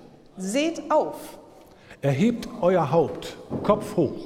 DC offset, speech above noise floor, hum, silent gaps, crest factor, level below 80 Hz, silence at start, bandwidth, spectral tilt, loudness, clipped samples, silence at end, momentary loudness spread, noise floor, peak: under 0.1%; 25 dB; none; none; 20 dB; -56 dBFS; 0 s; 16.5 kHz; -6.5 dB/octave; -24 LUFS; under 0.1%; 0 s; 13 LU; -48 dBFS; -6 dBFS